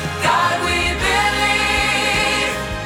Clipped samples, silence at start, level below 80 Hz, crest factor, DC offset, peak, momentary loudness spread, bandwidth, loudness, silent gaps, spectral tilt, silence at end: under 0.1%; 0 s; -32 dBFS; 14 dB; under 0.1%; -4 dBFS; 2 LU; 19 kHz; -16 LUFS; none; -3 dB/octave; 0 s